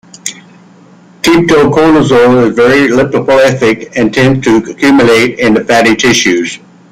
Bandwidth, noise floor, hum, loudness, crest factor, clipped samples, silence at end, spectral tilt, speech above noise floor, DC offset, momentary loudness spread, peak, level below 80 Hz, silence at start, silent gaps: 16 kHz; -38 dBFS; none; -7 LUFS; 8 dB; under 0.1%; 0.35 s; -5 dB/octave; 31 dB; under 0.1%; 8 LU; 0 dBFS; -38 dBFS; 0.25 s; none